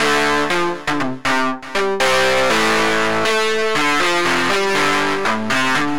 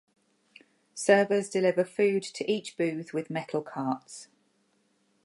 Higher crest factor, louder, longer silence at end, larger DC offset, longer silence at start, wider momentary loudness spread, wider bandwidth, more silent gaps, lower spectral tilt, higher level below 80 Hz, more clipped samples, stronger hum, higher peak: second, 12 dB vs 22 dB; first, -16 LUFS vs -28 LUFS; second, 0 s vs 1 s; first, 4% vs under 0.1%; second, 0 s vs 0.95 s; second, 5 LU vs 12 LU; first, 17 kHz vs 11.5 kHz; neither; second, -3 dB/octave vs -5 dB/octave; first, -46 dBFS vs -84 dBFS; neither; neither; first, -4 dBFS vs -8 dBFS